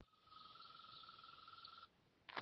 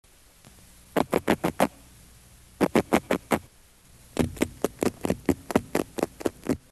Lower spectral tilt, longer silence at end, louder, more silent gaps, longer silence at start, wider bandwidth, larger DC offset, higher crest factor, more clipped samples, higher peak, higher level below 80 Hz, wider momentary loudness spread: second, 0 dB/octave vs -5.5 dB/octave; second, 0 s vs 0.15 s; second, -60 LUFS vs -28 LUFS; neither; second, 0 s vs 0.95 s; second, 6 kHz vs 13 kHz; neither; first, 30 dB vs 22 dB; neither; second, -30 dBFS vs -6 dBFS; second, -88 dBFS vs -50 dBFS; about the same, 6 LU vs 6 LU